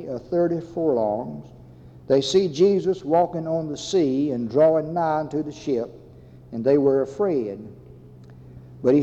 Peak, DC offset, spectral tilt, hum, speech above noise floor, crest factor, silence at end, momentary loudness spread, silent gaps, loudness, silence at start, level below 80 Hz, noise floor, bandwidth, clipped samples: -8 dBFS; under 0.1%; -6.5 dB/octave; none; 24 dB; 16 dB; 0 s; 11 LU; none; -22 LUFS; 0 s; -56 dBFS; -46 dBFS; 8.2 kHz; under 0.1%